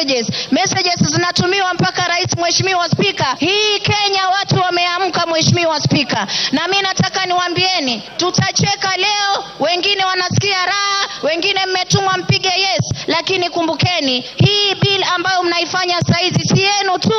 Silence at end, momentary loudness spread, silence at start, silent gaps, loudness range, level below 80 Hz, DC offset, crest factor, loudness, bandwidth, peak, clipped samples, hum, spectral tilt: 0 s; 3 LU; 0 s; none; 1 LU; -52 dBFS; under 0.1%; 16 dB; -14 LUFS; 8.8 kHz; 0 dBFS; under 0.1%; none; -3.5 dB/octave